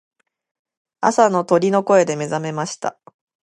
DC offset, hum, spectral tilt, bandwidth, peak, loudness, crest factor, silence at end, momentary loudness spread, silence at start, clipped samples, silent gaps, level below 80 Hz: under 0.1%; none; -5 dB/octave; 11.5 kHz; 0 dBFS; -18 LUFS; 20 dB; 0.5 s; 10 LU; 1 s; under 0.1%; none; -68 dBFS